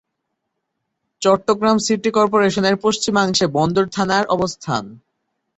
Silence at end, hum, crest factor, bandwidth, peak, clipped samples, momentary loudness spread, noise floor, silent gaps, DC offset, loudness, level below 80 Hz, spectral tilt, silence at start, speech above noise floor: 0.6 s; none; 16 dB; 8.2 kHz; -2 dBFS; under 0.1%; 5 LU; -76 dBFS; none; under 0.1%; -17 LUFS; -54 dBFS; -4.5 dB/octave; 1.2 s; 59 dB